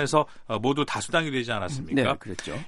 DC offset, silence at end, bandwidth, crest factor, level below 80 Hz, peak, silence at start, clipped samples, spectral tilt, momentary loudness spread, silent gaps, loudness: under 0.1%; 0 s; 11.5 kHz; 22 dB; -56 dBFS; -6 dBFS; 0 s; under 0.1%; -4.5 dB/octave; 6 LU; none; -27 LUFS